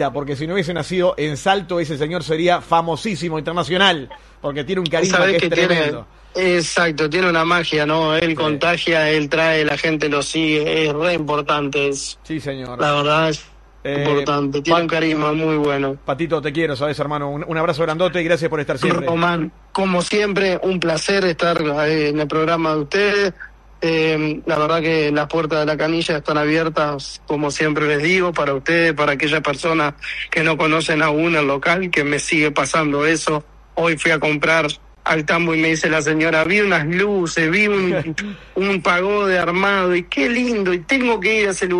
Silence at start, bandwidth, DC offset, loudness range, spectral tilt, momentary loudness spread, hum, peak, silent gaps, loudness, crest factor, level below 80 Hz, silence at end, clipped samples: 0 s; 11.5 kHz; under 0.1%; 3 LU; -4.5 dB/octave; 7 LU; none; 0 dBFS; none; -18 LUFS; 18 dB; -46 dBFS; 0 s; under 0.1%